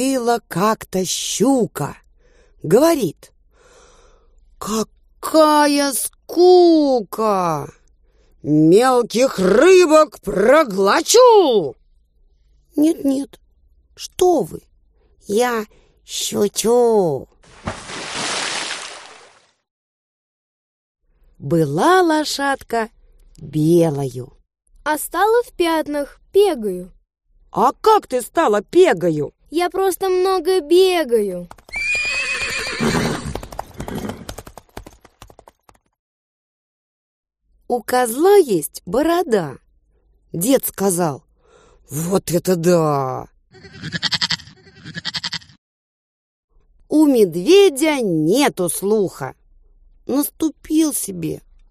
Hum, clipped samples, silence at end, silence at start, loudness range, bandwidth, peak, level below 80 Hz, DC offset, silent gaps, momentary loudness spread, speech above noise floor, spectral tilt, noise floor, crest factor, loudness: none; under 0.1%; 0.3 s; 0 s; 10 LU; 15.5 kHz; -2 dBFS; -48 dBFS; under 0.1%; 19.71-20.95 s, 35.99-37.23 s, 45.58-46.48 s; 17 LU; 42 dB; -4.5 dB/octave; -58 dBFS; 16 dB; -17 LUFS